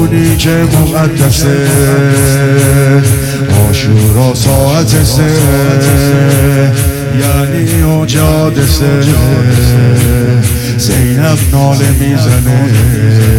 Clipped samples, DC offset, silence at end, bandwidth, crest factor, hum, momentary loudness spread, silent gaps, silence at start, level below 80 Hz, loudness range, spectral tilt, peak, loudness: under 0.1%; under 0.1%; 0 s; 17.5 kHz; 8 dB; none; 3 LU; none; 0 s; -20 dBFS; 1 LU; -5.5 dB/octave; 0 dBFS; -8 LUFS